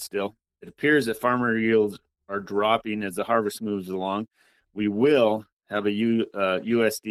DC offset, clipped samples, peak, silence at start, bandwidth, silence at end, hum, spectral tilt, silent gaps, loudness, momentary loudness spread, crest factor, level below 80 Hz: under 0.1%; under 0.1%; -8 dBFS; 0 s; 15 kHz; 0 s; none; -5.5 dB/octave; 5.52-5.57 s; -25 LUFS; 10 LU; 16 dB; -66 dBFS